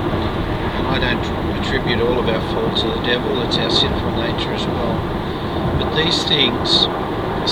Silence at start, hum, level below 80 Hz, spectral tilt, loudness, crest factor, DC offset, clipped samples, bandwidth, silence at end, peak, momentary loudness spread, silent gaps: 0 s; none; -30 dBFS; -5.5 dB/octave; -18 LUFS; 18 dB; under 0.1%; under 0.1%; 18 kHz; 0 s; 0 dBFS; 7 LU; none